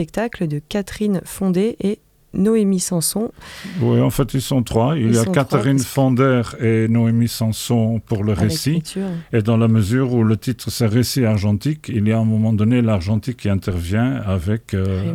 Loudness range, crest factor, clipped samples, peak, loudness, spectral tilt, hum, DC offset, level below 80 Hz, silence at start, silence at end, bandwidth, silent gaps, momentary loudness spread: 2 LU; 16 dB; under 0.1%; -2 dBFS; -18 LUFS; -6.5 dB/octave; none; under 0.1%; -44 dBFS; 0 s; 0 s; 16 kHz; none; 7 LU